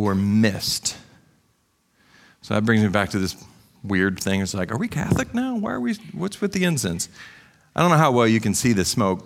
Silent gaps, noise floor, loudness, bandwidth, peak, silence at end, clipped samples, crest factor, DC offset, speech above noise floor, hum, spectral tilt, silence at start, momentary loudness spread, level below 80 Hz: none; -66 dBFS; -22 LUFS; 16.5 kHz; -4 dBFS; 0.05 s; under 0.1%; 20 dB; under 0.1%; 44 dB; none; -5 dB/octave; 0 s; 11 LU; -50 dBFS